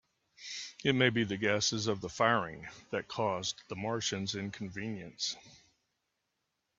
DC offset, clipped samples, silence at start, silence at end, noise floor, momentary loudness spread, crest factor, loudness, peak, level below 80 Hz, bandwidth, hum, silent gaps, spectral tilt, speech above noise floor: under 0.1%; under 0.1%; 0.4 s; 1.25 s; -83 dBFS; 13 LU; 24 dB; -33 LUFS; -12 dBFS; -70 dBFS; 8.4 kHz; none; none; -3.5 dB/octave; 50 dB